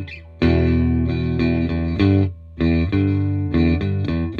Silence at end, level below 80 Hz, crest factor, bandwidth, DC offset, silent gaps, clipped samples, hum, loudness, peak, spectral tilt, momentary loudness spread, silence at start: 0 s; -30 dBFS; 14 dB; 5 kHz; under 0.1%; none; under 0.1%; none; -19 LUFS; -4 dBFS; -9.5 dB/octave; 5 LU; 0 s